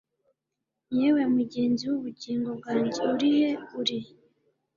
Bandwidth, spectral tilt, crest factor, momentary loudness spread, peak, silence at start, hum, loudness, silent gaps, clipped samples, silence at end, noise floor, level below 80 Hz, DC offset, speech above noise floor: 7.4 kHz; -5.5 dB/octave; 16 dB; 8 LU; -12 dBFS; 0.9 s; none; -27 LUFS; none; under 0.1%; 0.7 s; -85 dBFS; -70 dBFS; under 0.1%; 59 dB